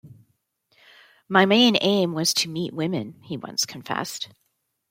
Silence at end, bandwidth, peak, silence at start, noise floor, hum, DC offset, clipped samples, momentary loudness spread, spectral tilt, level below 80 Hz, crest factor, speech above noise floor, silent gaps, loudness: 0.65 s; 16.5 kHz; -2 dBFS; 0.05 s; -69 dBFS; none; under 0.1%; under 0.1%; 17 LU; -3.5 dB/octave; -70 dBFS; 22 dB; 46 dB; none; -22 LUFS